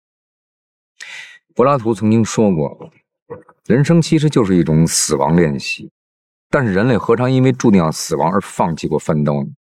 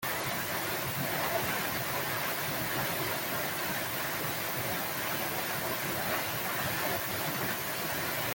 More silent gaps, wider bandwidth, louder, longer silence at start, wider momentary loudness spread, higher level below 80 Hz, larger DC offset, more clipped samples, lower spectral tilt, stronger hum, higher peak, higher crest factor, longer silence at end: first, 3.22-3.26 s, 5.91-6.50 s vs none; second, 14.5 kHz vs 17 kHz; first, -15 LUFS vs -31 LUFS; first, 1 s vs 0 s; first, 12 LU vs 2 LU; first, -46 dBFS vs -62 dBFS; neither; neither; first, -6 dB/octave vs -3 dB/octave; neither; first, 0 dBFS vs -18 dBFS; about the same, 16 dB vs 14 dB; about the same, 0.1 s vs 0 s